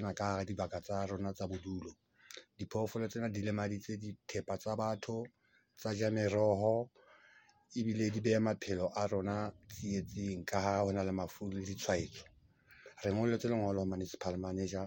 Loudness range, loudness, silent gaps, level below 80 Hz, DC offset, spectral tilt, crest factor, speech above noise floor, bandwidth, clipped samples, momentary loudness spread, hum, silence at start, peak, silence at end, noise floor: 5 LU; -37 LUFS; none; -66 dBFS; under 0.1%; -6 dB/octave; 20 dB; 29 dB; 17 kHz; under 0.1%; 12 LU; none; 0 s; -18 dBFS; 0 s; -65 dBFS